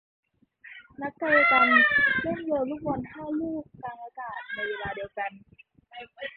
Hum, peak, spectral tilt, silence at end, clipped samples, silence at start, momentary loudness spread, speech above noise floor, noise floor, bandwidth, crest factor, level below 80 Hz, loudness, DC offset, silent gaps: none; -8 dBFS; -8.5 dB/octave; 0.05 s; under 0.1%; 0.65 s; 21 LU; 25 dB; -52 dBFS; 5.2 kHz; 20 dB; -60 dBFS; -24 LUFS; under 0.1%; none